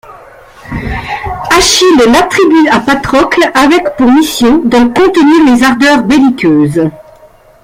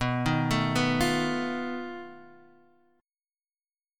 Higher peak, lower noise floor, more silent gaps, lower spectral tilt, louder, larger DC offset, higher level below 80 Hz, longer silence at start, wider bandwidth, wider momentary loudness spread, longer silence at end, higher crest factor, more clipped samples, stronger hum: first, 0 dBFS vs -12 dBFS; second, -39 dBFS vs under -90 dBFS; neither; second, -4 dB/octave vs -5.5 dB/octave; first, -7 LUFS vs -27 LUFS; neither; first, -32 dBFS vs -50 dBFS; about the same, 0.1 s vs 0 s; about the same, 16.5 kHz vs 17.5 kHz; second, 12 LU vs 15 LU; second, 0.65 s vs 1.65 s; second, 8 dB vs 18 dB; first, 0.1% vs under 0.1%; neither